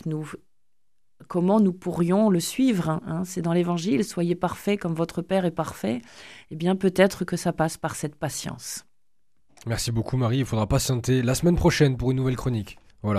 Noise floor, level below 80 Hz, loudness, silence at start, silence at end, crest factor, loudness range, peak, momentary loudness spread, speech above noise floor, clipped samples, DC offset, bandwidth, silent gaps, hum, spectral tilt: -82 dBFS; -44 dBFS; -25 LUFS; 0.05 s; 0 s; 22 dB; 4 LU; -2 dBFS; 13 LU; 58 dB; under 0.1%; 0.2%; 15 kHz; none; none; -6 dB/octave